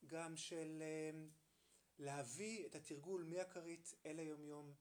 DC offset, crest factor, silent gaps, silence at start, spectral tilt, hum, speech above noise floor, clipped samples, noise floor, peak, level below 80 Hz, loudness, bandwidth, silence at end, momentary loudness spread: under 0.1%; 18 dB; none; 0 s; -4 dB/octave; none; 26 dB; under 0.1%; -77 dBFS; -34 dBFS; under -90 dBFS; -51 LUFS; over 20 kHz; 0.05 s; 6 LU